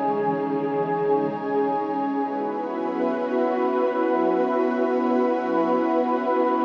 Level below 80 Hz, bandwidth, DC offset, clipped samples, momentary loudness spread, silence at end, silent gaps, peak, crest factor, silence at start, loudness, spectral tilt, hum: -76 dBFS; 6.8 kHz; under 0.1%; under 0.1%; 4 LU; 0 s; none; -10 dBFS; 12 dB; 0 s; -23 LUFS; -8 dB/octave; none